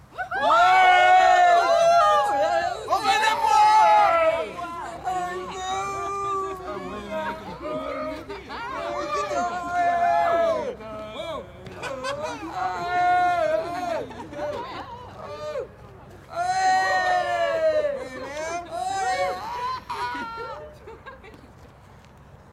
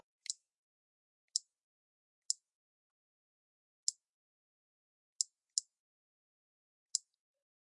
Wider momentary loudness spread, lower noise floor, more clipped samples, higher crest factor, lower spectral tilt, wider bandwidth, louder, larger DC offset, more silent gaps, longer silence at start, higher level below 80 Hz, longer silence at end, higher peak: first, 19 LU vs 5 LU; second, -49 dBFS vs under -90 dBFS; neither; second, 16 dB vs 34 dB; first, -3 dB/octave vs 9.5 dB/octave; first, 13.5 kHz vs 11 kHz; first, -22 LUFS vs -40 LUFS; neither; second, none vs 0.54-1.28 s, 1.63-2.29 s, 2.54-3.87 s, 4.09-5.19 s, 5.79-6.90 s; second, 0.1 s vs 0.3 s; first, -54 dBFS vs under -90 dBFS; second, 0.2 s vs 0.75 s; first, -8 dBFS vs -14 dBFS